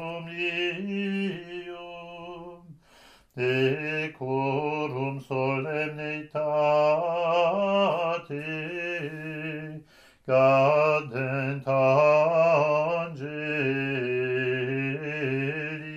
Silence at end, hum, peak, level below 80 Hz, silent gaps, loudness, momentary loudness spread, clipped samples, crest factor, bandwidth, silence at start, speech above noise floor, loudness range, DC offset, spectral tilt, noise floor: 0 s; none; -8 dBFS; -68 dBFS; none; -26 LUFS; 17 LU; under 0.1%; 18 dB; 8.2 kHz; 0 s; 27 dB; 8 LU; under 0.1%; -7 dB/octave; -56 dBFS